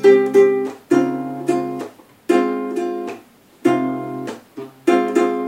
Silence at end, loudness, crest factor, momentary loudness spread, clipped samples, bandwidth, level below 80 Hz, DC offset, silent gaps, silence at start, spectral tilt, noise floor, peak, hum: 0 s; -19 LUFS; 16 dB; 18 LU; under 0.1%; 15.5 kHz; -72 dBFS; under 0.1%; none; 0 s; -6 dB/octave; -45 dBFS; -2 dBFS; none